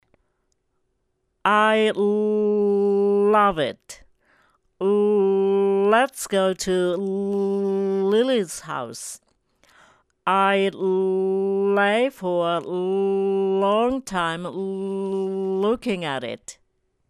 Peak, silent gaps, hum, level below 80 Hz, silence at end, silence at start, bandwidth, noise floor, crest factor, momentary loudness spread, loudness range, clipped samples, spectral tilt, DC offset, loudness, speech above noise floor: -4 dBFS; none; none; -58 dBFS; 0.55 s; 1.45 s; 13.5 kHz; -72 dBFS; 18 dB; 10 LU; 4 LU; under 0.1%; -5 dB/octave; under 0.1%; -22 LUFS; 51 dB